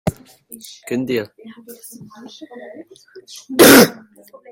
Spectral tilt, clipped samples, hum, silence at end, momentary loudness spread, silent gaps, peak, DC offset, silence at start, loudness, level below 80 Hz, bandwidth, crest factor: -3.5 dB/octave; under 0.1%; none; 0.6 s; 29 LU; none; 0 dBFS; under 0.1%; 0.05 s; -12 LUFS; -50 dBFS; 17 kHz; 18 dB